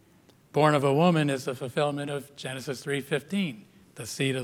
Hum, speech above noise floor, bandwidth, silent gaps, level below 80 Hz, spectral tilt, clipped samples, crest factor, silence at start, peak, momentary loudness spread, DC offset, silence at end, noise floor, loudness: none; 32 dB; 16.5 kHz; none; -72 dBFS; -5.5 dB/octave; under 0.1%; 20 dB; 0.55 s; -8 dBFS; 14 LU; under 0.1%; 0 s; -59 dBFS; -27 LUFS